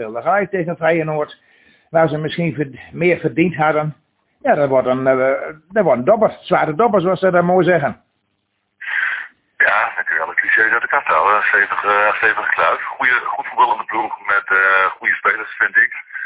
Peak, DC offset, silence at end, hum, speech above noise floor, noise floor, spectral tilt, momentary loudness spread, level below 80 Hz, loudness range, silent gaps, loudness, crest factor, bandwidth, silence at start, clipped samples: 0 dBFS; under 0.1%; 0 s; none; 53 dB; -69 dBFS; -9 dB/octave; 8 LU; -58 dBFS; 4 LU; none; -16 LUFS; 16 dB; 4 kHz; 0 s; under 0.1%